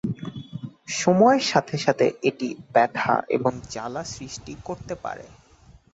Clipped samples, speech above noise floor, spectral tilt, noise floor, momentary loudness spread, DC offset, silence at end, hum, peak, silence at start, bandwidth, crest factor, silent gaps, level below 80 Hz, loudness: under 0.1%; 30 dB; -5 dB/octave; -53 dBFS; 18 LU; under 0.1%; 0.65 s; none; -4 dBFS; 0.05 s; 8.2 kHz; 20 dB; none; -56 dBFS; -23 LUFS